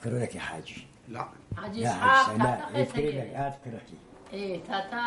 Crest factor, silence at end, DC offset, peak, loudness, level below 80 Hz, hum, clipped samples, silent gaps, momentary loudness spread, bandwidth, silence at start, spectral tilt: 20 dB; 0 s; under 0.1%; -8 dBFS; -28 LUFS; -58 dBFS; none; under 0.1%; none; 22 LU; 11.5 kHz; 0 s; -5 dB/octave